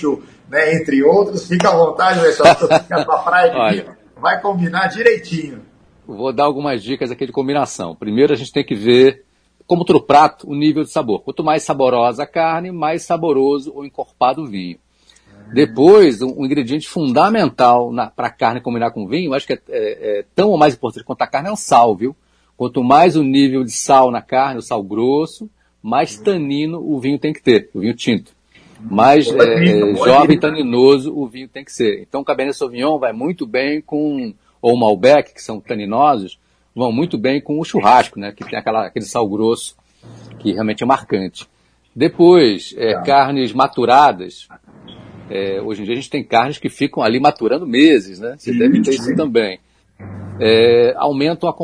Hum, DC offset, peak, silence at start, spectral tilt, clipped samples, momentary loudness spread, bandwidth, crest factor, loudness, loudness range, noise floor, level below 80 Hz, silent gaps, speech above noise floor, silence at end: none; under 0.1%; 0 dBFS; 0 s; -5.5 dB/octave; under 0.1%; 13 LU; 11 kHz; 14 dB; -15 LUFS; 6 LU; -51 dBFS; -54 dBFS; none; 37 dB; 0 s